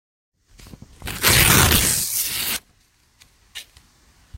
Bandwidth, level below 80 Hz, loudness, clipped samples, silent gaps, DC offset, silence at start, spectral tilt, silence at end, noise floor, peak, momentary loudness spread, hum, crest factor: 16.5 kHz; -34 dBFS; -16 LUFS; under 0.1%; none; under 0.1%; 0.6 s; -2 dB/octave; 0.75 s; -59 dBFS; 0 dBFS; 26 LU; none; 22 dB